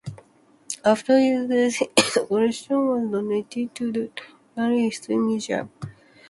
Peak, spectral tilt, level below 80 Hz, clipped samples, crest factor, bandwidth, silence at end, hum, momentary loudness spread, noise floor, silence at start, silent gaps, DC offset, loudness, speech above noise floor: -2 dBFS; -4 dB/octave; -64 dBFS; under 0.1%; 22 dB; 11.5 kHz; 0.4 s; none; 17 LU; -56 dBFS; 0.05 s; none; under 0.1%; -23 LUFS; 34 dB